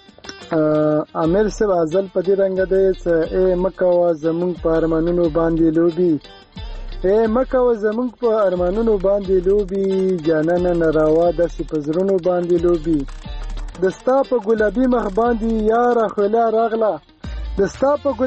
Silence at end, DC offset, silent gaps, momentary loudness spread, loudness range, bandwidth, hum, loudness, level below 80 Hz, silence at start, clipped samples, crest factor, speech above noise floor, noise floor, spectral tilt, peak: 0 s; under 0.1%; none; 7 LU; 2 LU; 8.4 kHz; none; -18 LUFS; -34 dBFS; 0.25 s; under 0.1%; 12 dB; 21 dB; -38 dBFS; -7.5 dB/octave; -6 dBFS